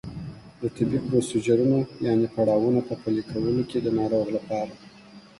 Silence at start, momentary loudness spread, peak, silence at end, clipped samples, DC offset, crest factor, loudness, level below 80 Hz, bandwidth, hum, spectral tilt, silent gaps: 0.05 s; 12 LU; -8 dBFS; 0.2 s; under 0.1%; under 0.1%; 16 dB; -25 LUFS; -54 dBFS; 11.5 kHz; none; -7.5 dB/octave; none